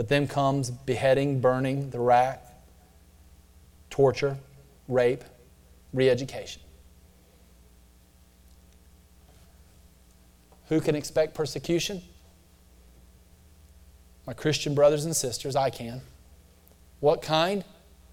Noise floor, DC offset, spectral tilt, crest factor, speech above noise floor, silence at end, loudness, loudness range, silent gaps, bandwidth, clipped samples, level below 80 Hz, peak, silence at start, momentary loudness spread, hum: -57 dBFS; under 0.1%; -5 dB/octave; 20 dB; 32 dB; 0.5 s; -26 LUFS; 7 LU; none; 17 kHz; under 0.1%; -54 dBFS; -8 dBFS; 0 s; 17 LU; none